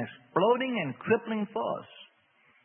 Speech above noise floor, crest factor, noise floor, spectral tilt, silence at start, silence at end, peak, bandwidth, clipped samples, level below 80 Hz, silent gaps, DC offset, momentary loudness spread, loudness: 36 dB; 20 dB; -65 dBFS; -10 dB/octave; 0 s; 0.6 s; -10 dBFS; 3.6 kHz; under 0.1%; -78 dBFS; none; under 0.1%; 10 LU; -29 LUFS